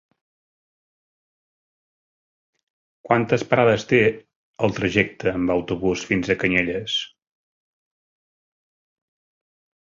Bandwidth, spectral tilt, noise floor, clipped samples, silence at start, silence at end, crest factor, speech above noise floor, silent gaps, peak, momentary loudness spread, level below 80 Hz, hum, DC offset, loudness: 7.6 kHz; -5.5 dB/octave; under -90 dBFS; under 0.1%; 3.05 s; 2.85 s; 22 dB; over 69 dB; 4.36-4.54 s; -2 dBFS; 7 LU; -52 dBFS; none; under 0.1%; -21 LUFS